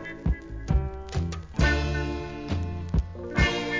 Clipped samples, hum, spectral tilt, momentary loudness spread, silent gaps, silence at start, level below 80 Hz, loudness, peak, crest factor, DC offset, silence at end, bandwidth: under 0.1%; none; -6 dB/octave; 8 LU; none; 0 s; -30 dBFS; -29 LUFS; -10 dBFS; 18 dB; under 0.1%; 0 s; 7.6 kHz